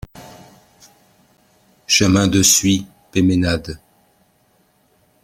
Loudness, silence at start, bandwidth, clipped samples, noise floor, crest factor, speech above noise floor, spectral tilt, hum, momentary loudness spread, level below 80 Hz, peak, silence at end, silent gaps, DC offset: -15 LUFS; 0.15 s; 16.5 kHz; under 0.1%; -59 dBFS; 20 dB; 44 dB; -3.5 dB/octave; none; 20 LU; -46 dBFS; 0 dBFS; 1.5 s; none; under 0.1%